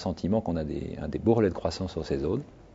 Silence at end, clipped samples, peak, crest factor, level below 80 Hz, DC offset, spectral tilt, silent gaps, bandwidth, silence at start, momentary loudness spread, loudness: 0 s; under 0.1%; -10 dBFS; 20 dB; -46 dBFS; under 0.1%; -7.5 dB/octave; none; 7.8 kHz; 0 s; 10 LU; -29 LUFS